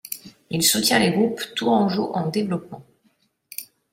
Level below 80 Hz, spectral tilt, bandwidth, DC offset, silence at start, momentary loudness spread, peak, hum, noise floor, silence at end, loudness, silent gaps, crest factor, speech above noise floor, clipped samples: -62 dBFS; -3.5 dB/octave; 16.5 kHz; under 0.1%; 0.05 s; 18 LU; -4 dBFS; none; -65 dBFS; 0.3 s; -21 LUFS; none; 18 dB; 44 dB; under 0.1%